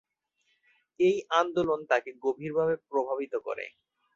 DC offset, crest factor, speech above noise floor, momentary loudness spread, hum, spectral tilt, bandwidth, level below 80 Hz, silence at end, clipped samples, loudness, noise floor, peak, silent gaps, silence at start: under 0.1%; 20 dB; 47 dB; 8 LU; none; -5.5 dB/octave; 7.6 kHz; -70 dBFS; 0.45 s; under 0.1%; -29 LUFS; -75 dBFS; -10 dBFS; none; 1 s